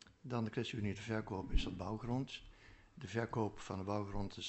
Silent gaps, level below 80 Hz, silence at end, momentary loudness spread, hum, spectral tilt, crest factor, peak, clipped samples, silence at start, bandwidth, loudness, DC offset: none; -48 dBFS; 0 s; 11 LU; none; -6 dB/octave; 20 dB; -20 dBFS; under 0.1%; 0.05 s; 8.2 kHz; -42 LUFS; under 0.1%